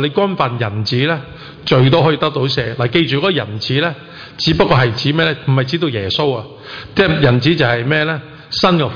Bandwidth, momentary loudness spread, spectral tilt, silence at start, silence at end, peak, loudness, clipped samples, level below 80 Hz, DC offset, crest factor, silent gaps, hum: 5.4 kHz; 10 LU; -6.5 dB/octave; 0 s; 0 s; -2 dBFS; -15 LUFS; under 0.1%; -42 dBFS; under 0.1%; 12 dB; none; none